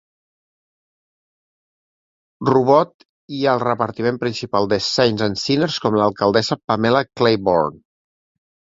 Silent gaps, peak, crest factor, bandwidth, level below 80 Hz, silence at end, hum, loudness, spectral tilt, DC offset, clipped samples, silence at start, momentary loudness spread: 2.94-2.99 s, 3.05-3.28 s, 6.64-6.68 s; 0 dBFS; 18 dB; 7.8 kHz; -54 dBFS; 0.95 s; none; -18 LUFS; -5.5 dB/octave; under 0.1%; under 0.1%; 2.4 s; 6 LU